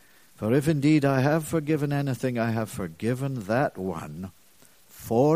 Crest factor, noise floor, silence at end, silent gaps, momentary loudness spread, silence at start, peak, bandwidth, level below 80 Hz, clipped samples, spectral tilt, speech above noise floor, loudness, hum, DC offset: 18 dB; -58 dBFS; 0 s; none; 13 LU; 0.4 s; -8 dBFS; 15.5 kHz; -58 dBFS; under 0.1%; -7 dB/octave; 33 dB; -26 LUFS; none; 0.1%